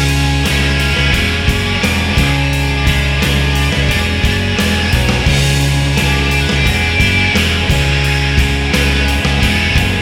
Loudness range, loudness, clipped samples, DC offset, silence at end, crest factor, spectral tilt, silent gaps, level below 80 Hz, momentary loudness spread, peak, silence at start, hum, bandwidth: 1 LU; -13 LUFS; under 0.1%; under 0.1%; 0 s; 12 dB; -4.5 dB/octave; none; -18 dBFS; 2 LU; 0 dBFS; 0 s; none; 17 kHz